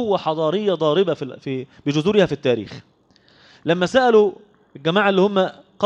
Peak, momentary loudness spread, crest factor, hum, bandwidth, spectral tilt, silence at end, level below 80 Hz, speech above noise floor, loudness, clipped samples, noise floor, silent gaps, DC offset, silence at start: -4 dBFS; 12 LU; 16 dB; none; 8.6 kHz; -6 dB/octave; 0 s; -58 dBFS; 36 dB; -19 LUFS; under 0.1%; -55 dBFS; none; under 0.1%; 0 s